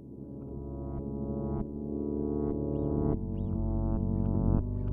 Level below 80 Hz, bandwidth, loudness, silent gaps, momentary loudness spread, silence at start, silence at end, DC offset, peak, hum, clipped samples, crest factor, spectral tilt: -38 dBFS; 2 kHz; -33 LUFS; none; 10 LU; 0 s; 0 s; under 0.1%; -14 dBFS; none; under 0.1%; 18 dB; -14 dB/octave